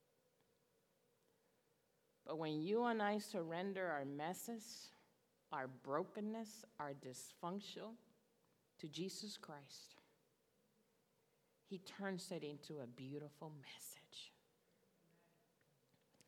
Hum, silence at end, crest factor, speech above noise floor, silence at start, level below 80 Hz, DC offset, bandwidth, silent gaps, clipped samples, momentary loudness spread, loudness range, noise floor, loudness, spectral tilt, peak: none; 2 s; 22 dB; 34 dB; 2.25 s; under -90 dBFS; under 0.1%; 18 kHz; none; under 0.1%; 16 LU; 11 LU; -81 dBFS; -48 LUFS; -4.5 dB/octave; -26 dBFS